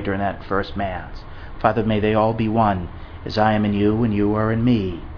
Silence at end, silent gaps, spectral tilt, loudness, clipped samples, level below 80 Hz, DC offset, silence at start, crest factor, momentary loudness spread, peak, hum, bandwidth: 0 s; none; -9 dB/octave; -20 LUFS; under 0.1%; -36 dBFS; under 0.1%; 0 s; 20 dB; 15 LU; 0 dBFS; none; 5.4 kHz